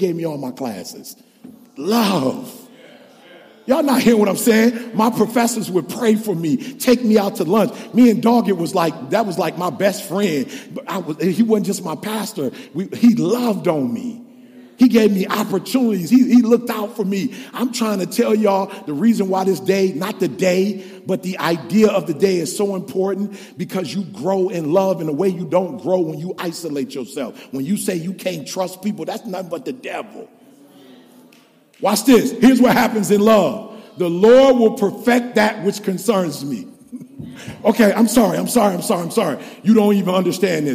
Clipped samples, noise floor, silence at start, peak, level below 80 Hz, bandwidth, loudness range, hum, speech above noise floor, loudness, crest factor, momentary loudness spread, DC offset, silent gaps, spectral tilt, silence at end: under 0.1%; -51 dBFS; 0 s; -2 dBFS; -58 dBFS; 15.5 kHz; 8 LU; none; 34 dB; -17 LUFS; 14 dB; 14 LU; under 0.1%; none; -5.5 dB/octave; 0 s